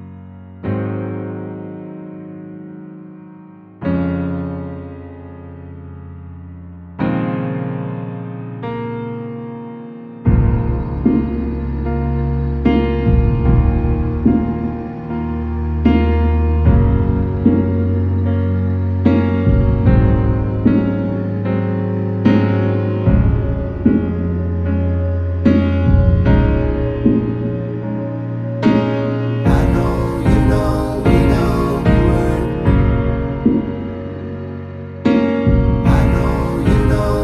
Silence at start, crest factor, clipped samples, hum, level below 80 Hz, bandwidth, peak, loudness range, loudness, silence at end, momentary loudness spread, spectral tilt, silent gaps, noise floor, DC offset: 0 s; 16 dB; under 0.1%; none; -22 dBFS; 12 kHz; 0 dBFS; 10 LU; -17 LUFS; 0 s; 18 LU; -9.5 dB/octave; none; -39 dBFS; under 0.1%